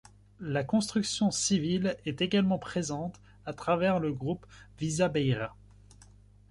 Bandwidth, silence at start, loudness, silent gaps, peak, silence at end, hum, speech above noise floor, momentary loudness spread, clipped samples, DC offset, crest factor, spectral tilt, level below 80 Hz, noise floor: 11.5 kHz; 0.4 s; -30 LUFS; none; -14 dBFS; 0.5 s; 50 Hz at -50 dBFS; 27 dB; 12 LU; under 0.1%; under 0.1%; 16 dB; -5 dB/octave; -58 dBFS; -56 dBFS